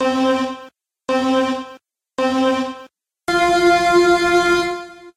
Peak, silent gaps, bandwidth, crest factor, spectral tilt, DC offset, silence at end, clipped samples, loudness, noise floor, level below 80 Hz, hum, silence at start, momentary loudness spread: -4 dBFS; none; 13.5 kHz; 14 dB; -3.5 dB/octave; under 0.1%; 0.05 s; under 0.1%; -17 LUFS; -44 dBFS; -48 dBFS; none; 0 s; 17 LU